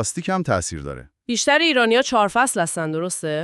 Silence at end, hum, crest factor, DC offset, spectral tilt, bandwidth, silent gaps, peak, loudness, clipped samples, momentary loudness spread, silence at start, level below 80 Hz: 0 s; none; 16 dB; under 0.1%; -3 dB/octave; 14 kHz; none; -4 dBFS; -19 LUFS; under 0.1%; 13 LU; 0 s; -48 dBFS